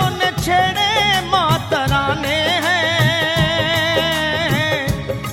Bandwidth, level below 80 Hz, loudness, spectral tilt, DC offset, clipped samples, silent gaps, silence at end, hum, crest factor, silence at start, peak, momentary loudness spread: over 20 kHz; -36 dBFS; -16 LUFS; -4 dB/octave; 0.2%; under 0.1%; none; 0 s; none; 14 dB; 0 s; -4 dBFS; 3 LU